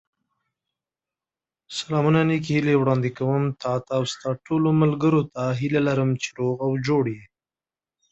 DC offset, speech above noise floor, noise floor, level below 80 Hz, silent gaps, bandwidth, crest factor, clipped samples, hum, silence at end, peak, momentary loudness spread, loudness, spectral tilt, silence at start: under 0.1%; over 68 dB; under -90 dBFS; -60 dBFS; none; 8.2 kHz; 18 dB; under 0.1%; none; 0.85 s; -6 dBFS; 8 LU; -23 LUFS; -7 dB/octave; 1.7 s